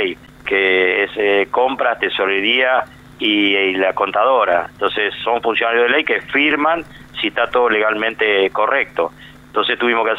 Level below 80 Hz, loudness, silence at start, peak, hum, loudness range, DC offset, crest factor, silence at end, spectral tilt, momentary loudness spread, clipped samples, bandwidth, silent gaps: -52 dBFS; -16 LUFS; 0 s; -4 dBFS; none; 1 LU; under 0.1%; 14 dB; 0 s; -5 dB/octave; 7 LU; under 0.1%; 11 kHz; none